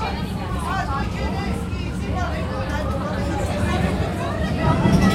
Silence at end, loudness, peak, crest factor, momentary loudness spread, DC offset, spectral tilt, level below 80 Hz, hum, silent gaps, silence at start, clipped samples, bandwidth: 0 s; -23 LUFS; -4 dBFS; 18 dB; 7 LU; under 0.1%; -6.5 dB/octave; -30 dBFS; none; none; 0 s; under 0.1%; 15.5 kHz